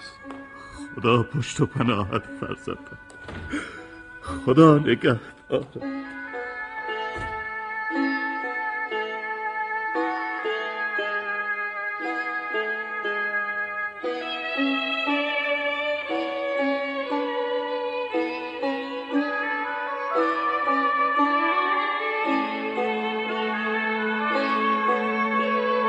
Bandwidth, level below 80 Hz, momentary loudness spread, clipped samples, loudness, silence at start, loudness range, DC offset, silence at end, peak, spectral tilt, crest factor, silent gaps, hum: 10.5 kHz; -56 dBFS; 11 LU; under 0.1%; -25 LUFS; 0 s; 5 LU; under 0.1%; 0 s; -2 dBFS; -6 dB/octave; 22 dB; none; none